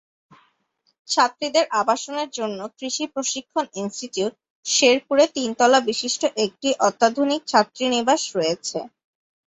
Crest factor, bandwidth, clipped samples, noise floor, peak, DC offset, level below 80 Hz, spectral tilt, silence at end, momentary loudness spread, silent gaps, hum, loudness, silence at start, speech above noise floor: 20 dB; 8.4 kHz; under 0.1%; -69 dBFS; -2 dBFS; under 0.1%; -68 dBFS; -2 dB/octave; 0.65 s; 11 LU; 4.50-4.63 s; none; -21 LUFS; 1.1 s; 48 dB